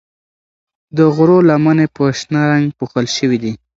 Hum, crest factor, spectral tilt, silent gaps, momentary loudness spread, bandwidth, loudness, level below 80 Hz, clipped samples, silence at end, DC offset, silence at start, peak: none; 14 dB; -6.5 dB/octave; none; 9 LU; 7.8 kHz; -13 LUFS; -54 dBFS; under 0.1%; 0.2 s; under 0.1%; 0.95 s; 0 dBFS